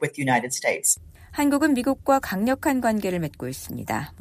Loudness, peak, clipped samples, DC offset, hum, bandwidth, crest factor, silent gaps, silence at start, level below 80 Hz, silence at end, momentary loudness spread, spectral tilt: -23 LUFS; -8 dBFS; under 0.1%; under 0.1%; none; 15.5 kHz; 16 dB; none; 0 s; -50 dBFS; 0.05 s; 10 LU; -4 dB/octave